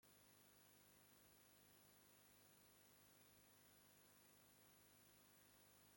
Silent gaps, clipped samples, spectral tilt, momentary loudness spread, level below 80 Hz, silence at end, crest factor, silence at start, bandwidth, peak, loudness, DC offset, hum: none; under 0.1%; -2.5 dB/octave; 0 LU; under -90 dBFS; 0 s; 16 dB; 0 s; 16.5 kHz; -56 dBFS; -70 LUFS; under 0.1%; 50 Hz at -85 dBFS